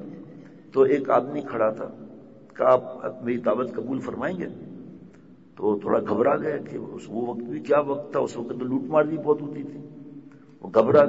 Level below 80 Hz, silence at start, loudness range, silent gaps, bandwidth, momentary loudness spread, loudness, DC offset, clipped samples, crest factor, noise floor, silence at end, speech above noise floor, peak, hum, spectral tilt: -66 dBFS; 0 s; 3 LU; none; 8 kHz; 22 LU; -25 LUFS; 0.1%; under 0.1%; 20 dB; -50 dBFS; 0 s; 26 dB; -6 dBFS; none; -8 dB/octave